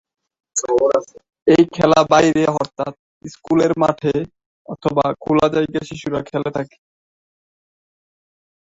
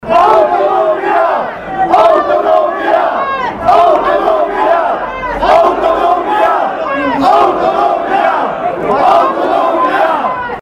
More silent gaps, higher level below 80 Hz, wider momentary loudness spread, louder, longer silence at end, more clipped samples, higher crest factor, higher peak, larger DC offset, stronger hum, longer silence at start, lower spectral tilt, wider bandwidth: first, 1.42-1.46 s, 2.99-3.21 s, 4.46-4.65 s vs none; second, -52 dBFS vs -40 dBFS; first, 14 LU vs 7 LU; second, -18 LUFS vs -11 LUFS; first, 2.1 s vs 0 s; second, under 0.1% vs 0.2%; first, 18 dB vs 10 dB; about the same, 0 dBFS vs 0 dBFS; neither; neither; first, 0.55 s vs 0 s; about the same, -5.5 dB/octave vs -5.5 dB/octave; second, 8 kHz vs 11.5 kHz